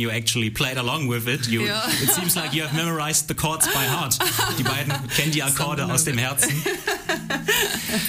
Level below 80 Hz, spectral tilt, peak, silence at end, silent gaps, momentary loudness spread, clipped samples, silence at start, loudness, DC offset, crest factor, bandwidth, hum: -48 dBFS; -3 dB/octave; -4 dBFS; 0 s; none; 5 LU; under 0.1%; 0 s; -21 LUFS; under 0.1%; 18 dB; 15.5 kHz; none